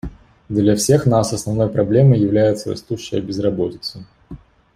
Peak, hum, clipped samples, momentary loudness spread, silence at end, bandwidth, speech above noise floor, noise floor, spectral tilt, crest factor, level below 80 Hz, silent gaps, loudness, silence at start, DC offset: -2 dBFS; none; under 0.1%; 12 LU; 0.4 s; 15 kHz; 23 dB; -39 dBFS; -6.5 dB/octave; 16 dB; -44 dBFS; none; -17 LUFS; 0.05 s; under 0.1%